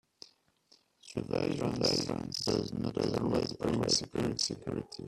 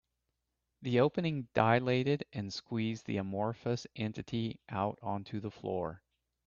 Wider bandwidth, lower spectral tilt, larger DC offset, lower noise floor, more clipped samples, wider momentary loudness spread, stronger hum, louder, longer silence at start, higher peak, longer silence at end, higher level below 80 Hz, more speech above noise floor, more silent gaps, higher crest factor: first, 14 kHz vs 7.2 kHz; second, -4.5 dB/octave vs -7 dB/octave; neither; second, -68 dBFS vs -85 dBFS; neither; second, 7 LU vs 11 LU; neither; about the same, -33 LUFS vs -35 LUFS; first, 1.05 s vs 0.8 s; second, -16 dBFS vs -10 dBFS; second, 0 s vs 0.5 s; first, -58 dBFS vs -68 dBFS; second, 35 dB vs 51 dB; neither; second, 18 dB vs 24 dB